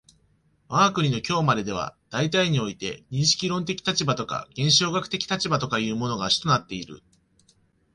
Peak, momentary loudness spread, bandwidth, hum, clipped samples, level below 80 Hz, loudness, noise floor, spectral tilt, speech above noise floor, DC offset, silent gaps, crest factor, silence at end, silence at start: -6 dBFS; 11 LU; 11.5 kHz; none; under 0.1%; -56 dBFS; -24 LUFS; -64 dBFS; -4 dB/octave; 40 dB; under 0.1%; none; 20 dB; 0.95 s; 0.7 s